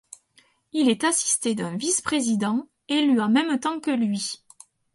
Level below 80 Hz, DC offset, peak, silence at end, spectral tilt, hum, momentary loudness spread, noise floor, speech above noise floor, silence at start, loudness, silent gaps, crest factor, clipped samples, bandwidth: -68 dBFS; under 0.1%; -8 dBFS; 0.6 s; -3 dB/octave; none; 8 LU; -61 dBFS; 39 dB; 0.75 s; -23 LUFS; none; 18 dB; under 0.1%; 11.5 kHz